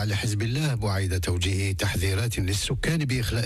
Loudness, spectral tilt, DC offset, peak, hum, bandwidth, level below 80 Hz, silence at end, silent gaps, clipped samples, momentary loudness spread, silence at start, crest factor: -26 LUFS; -5 dB/octave; under 0.1%; -14 dBFS; none; 15.5 kHz; -38 dBFS; 0 s; none; under 0.1%; 1 LU; 0 s; 10 dB